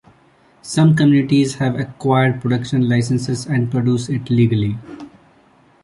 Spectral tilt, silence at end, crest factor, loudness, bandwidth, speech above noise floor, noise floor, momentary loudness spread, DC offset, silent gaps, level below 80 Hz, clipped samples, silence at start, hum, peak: -7 dB/octave; 0.75 s; 14 dB; -17 LUFS; 11.5 kHz; 36 dB; -52 dBFS; 10 LU; under 0.1%; none; -50 dBFS; under 0.1%; 0.65 s; none; -4 dBFS